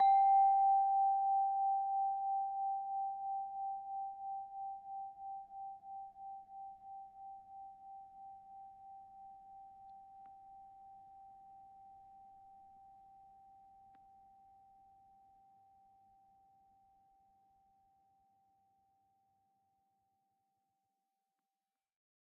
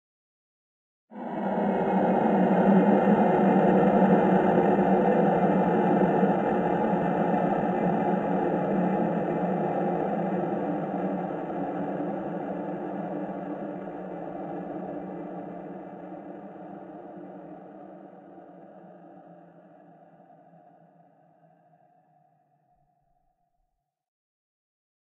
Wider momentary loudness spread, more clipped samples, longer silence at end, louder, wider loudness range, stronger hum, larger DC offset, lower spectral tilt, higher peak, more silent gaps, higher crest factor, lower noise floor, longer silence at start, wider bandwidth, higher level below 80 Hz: first, 27 LU vs 21 LU; neither; first, 9.7 s vs 5.85 s; second, -36 LUFS vs -25 LUFS; first, 26 LU vs 21 LU; neither; neither; second, -1 dB/octave vs -10 dB/octave; second, -24 dBFS vs -8 dBFS; neither; about the same, 18 dB vs 20 dB; first, under -90 dBFS vs -78 dBFS; second, 0 s vs 1.1 s; about the same, 4 kHz vs 3.9 kHz; second, -82 dBFS vs -64 dBFS